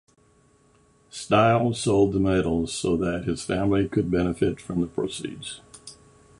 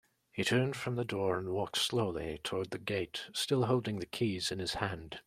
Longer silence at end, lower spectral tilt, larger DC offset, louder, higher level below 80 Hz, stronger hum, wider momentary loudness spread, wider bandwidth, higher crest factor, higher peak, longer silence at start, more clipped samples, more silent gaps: first, 0.45 s vs 0.05 s; first, -6 dB/octave vs -4.5 dB/octave; neither; first, -24 LUFS vs -34 LUFS; first, -46 dBFS vs -62 dBFS; neither; first, 18 LU vs 7 LU; second, 11.5 kHz vs 16 kHz; about the same, 20 dB vs 20 dB; first, -6 dBFS vs -14 dBFS; first, 1.15 s vs 0.35 s; neither; neither